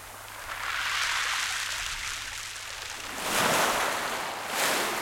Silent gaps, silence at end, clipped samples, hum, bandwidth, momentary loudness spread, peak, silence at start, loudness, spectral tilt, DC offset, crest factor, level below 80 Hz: none; 0 s; under 0.1%; none; 17 kHz; 11 LU; -12 dBFS; 0 s; -28 LUFS; -0.5 dB/octave; under 0.1%; 18 dB; -54 dBFS